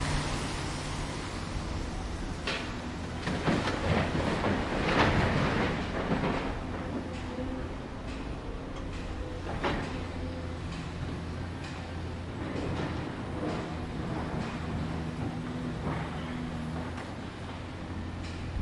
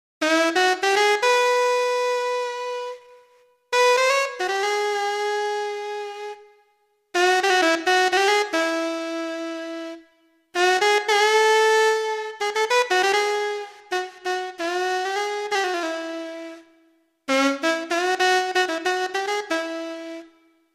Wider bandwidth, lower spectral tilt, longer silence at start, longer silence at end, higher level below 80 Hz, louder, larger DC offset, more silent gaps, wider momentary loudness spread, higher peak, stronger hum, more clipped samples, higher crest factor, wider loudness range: second, 11.5 kHz vs 15.5 kHz; first, -6 dB/octave vs 0 dB/octave; second, 0 s vs 0.2 s; second, 0 s vs 0.5 s; first, -42 dBFS vs -78 dBFS; second, -34 LUFS vs -21 LUFS; neither; neither; second, 10 LU vs 14 LU; second, -10 dBFS vs -6 dBFS; neither; neither; first, 22 dB vs 16 dB; first, 8 LU vs 5 LU